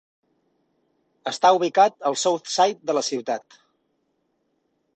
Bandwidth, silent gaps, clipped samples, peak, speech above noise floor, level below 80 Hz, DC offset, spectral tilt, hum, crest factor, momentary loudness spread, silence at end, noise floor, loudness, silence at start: 9 kHz; none; under 0.1%; -4 dBFS; 50 dB; -74 dBFS; under 0.1%; -2.5 dB/octave; none; 20 dB; 13 LU; 1.6 s; -72 dBFS; -21 LUFS; 1.25 s